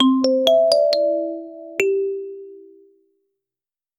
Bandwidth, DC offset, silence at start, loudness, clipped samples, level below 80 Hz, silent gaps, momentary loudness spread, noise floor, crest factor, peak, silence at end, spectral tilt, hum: 14.5 kHz; under 0.1%; 0 s; -18 LUFS; under 0.1%; -70 dBFS; none; 17 LU; under -90 dBFS; 20 dB; 0 dBFS; 1.4 s; -3 dB/octave; none